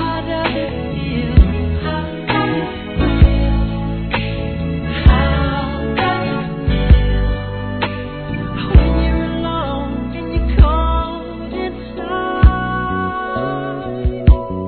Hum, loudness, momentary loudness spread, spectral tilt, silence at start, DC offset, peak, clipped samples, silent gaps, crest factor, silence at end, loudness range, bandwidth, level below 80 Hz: none; -18 LUFS; 10 LU; -10.5 dB/octave; 0 s; 0.2%; 0 dBFS; 0.2%; none; 16 dB; 0 s; 2 LU; 4.5 kHz; -18 dBFS